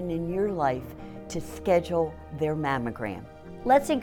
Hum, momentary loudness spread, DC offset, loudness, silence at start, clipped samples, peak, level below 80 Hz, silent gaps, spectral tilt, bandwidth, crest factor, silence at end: none; 15 LU; under 0.1%; -28 LUFS; 0 s; under 0.1%; -10 dBFS; -48 dBFS; none; -6.5 dB/octave; 17.5 kHz; 18 dB; 0 s